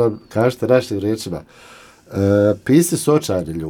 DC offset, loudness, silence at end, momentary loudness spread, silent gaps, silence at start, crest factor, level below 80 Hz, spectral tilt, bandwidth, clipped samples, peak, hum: under 0.1%; -17 LUFS; 0 s; 11 LU; none; 0 s; 16 dB; -50 dBFS; -6 dB/octave; 19 kHz; under 0.1%; 0 dBFS; none